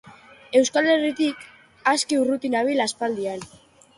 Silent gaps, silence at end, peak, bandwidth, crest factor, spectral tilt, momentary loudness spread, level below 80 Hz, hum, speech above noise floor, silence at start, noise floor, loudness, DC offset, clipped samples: none; 0.5 s; -6 dBFS; 11.5 kHz; 18 dB; -2.5 dB/octave; 10 LU; -68 dBFS; none; 22 dB; 0.05 s; -44 dBFS; -22 LUFS; under 0.1%; under 0.1%